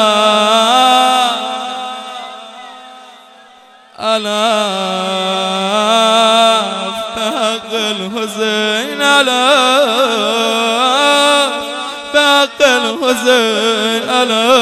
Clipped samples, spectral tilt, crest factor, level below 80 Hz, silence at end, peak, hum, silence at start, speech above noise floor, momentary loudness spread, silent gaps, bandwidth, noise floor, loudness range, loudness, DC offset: under 0.1%; -2 dB/octave; 14 dB; -60 dBFS; 0 s; 0 dBFS; none; 0 s; 30 dB; 12 LU; none; 16 kHz; -42 dBFS; 7 LU; -12 LUFS; under 0.1%